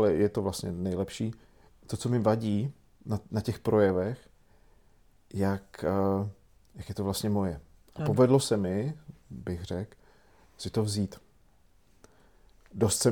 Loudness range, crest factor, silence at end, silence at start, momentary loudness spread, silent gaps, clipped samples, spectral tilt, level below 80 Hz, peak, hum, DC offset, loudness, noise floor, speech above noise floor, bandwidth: 7 LU; 20 dB; 0 s; 0 s; 17 LU; none; under 0.1%; -6 dB/octave; -58 dBFS; -10 dBFS; none; under 0.1%; -30 LUFS; -64 dBFS; 36 dB; 20 kHz